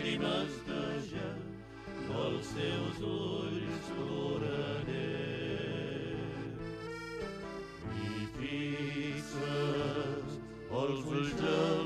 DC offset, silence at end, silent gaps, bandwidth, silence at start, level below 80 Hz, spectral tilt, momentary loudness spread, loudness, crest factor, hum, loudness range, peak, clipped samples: under 0.1%; 0 s; none; 13 kHz; 0 s; -58 dBFS; -6 dB/octave; 9 LU; -37 LUFS; 18 dB; none; 3 LU; -18 dBFS; under 0.1%